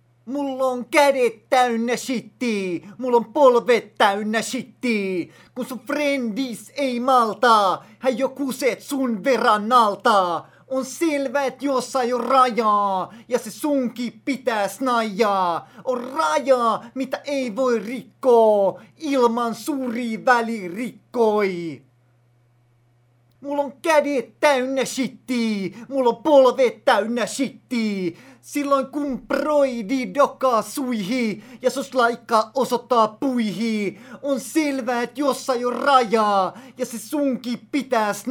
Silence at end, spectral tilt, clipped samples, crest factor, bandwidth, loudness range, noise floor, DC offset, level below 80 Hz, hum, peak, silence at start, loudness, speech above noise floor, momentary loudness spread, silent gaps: 0 s; -4 dB/octave; under 0.1%; 18 dB; 18.5 kHz; 4 LU; -59 dBFS; under 0.1%; -68 dBFS; none; -2 dBFS; 0.25 s; -21 LUFS; 38 dB; 11 LU; none